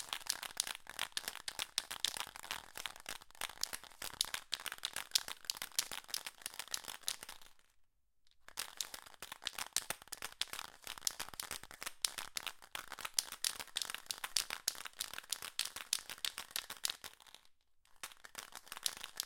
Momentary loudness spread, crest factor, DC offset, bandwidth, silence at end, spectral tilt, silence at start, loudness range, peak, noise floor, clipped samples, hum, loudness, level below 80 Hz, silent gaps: 11 LU; 36 dB; under 0.1%; 17 kHz; 0 s; 2 dB/octave; 0 s; 5 LU; -8 dBFS; -72 dBFS; under 0.1%; none; -41 LUFS; -72 dBFS; none